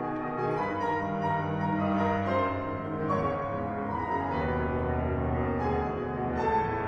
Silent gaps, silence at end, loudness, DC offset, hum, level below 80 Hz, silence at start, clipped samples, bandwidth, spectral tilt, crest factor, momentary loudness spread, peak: none; 0 s; -30 LUFS; under 0.1%; none; -44 dBFS; 0 s; under 0.1%; 7.4 kHz; -8.5 dB/octave; 14 dB; 5 LU; -16 dBFS